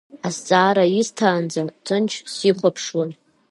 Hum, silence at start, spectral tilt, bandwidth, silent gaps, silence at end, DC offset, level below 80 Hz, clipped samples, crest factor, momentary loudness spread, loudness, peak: none; 0.15 s; -4.5 dB/octave; 11.5 kHz; none; 0.35 s; under 0.1%; -70 dBFS; under 0.1%; 18 dB; 10 LU; -20 LUFS; -2 dBFS